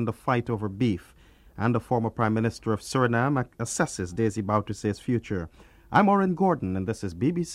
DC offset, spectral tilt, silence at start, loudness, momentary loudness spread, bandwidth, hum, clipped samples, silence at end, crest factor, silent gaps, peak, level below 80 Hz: under 0.1%; -6.5 dB/octave; 0 s; -26 LUFS; 8 LU; 13.5 kHz; none; under 0.1%; 0 s; 20 dB; none; -6 dBFS; -54 dBFS